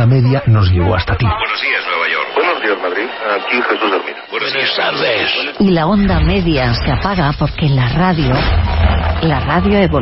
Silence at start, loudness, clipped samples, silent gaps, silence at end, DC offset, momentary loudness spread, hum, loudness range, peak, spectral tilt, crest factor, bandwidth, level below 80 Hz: 0 s; -14 LUFS; under 0.1%; none; 0 s; under 0.1%; 4 LU; none; 2 LU; 0 dBFS; -10.5 dB/octave; 12 dB; 5.8 kHz; -24 dBFS